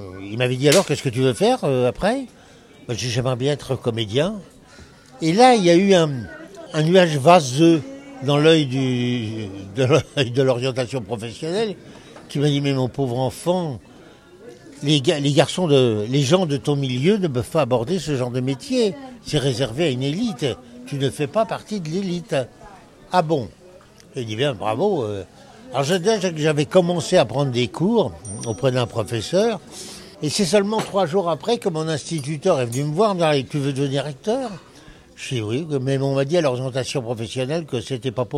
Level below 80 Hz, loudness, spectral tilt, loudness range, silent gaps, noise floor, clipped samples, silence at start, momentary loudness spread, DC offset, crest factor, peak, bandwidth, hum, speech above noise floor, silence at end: -54 dBFS; -20 LUFS; -5.5 dB/octave; 7 LU; none; -47 dBFS; under 0.1%; 0 s; 13 LU; under 0.1%; 20 dB; 0 dBFS; 15 kHz; none; 27 dB; 0 s